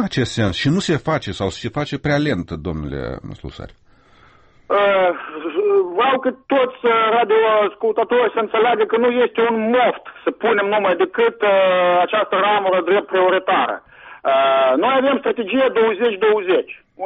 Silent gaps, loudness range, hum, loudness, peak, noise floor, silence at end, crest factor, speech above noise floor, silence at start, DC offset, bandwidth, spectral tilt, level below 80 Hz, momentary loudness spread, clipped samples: none; 6 LU; none; -17 LUFS; -6 dBFS; -50 dBFS; 0 s; 12 dB; 33 dB; 0 s; under 0.1%; 8.4 kHz; -6 dB/octave; -46 dBFS; 10 LU; under 0.1%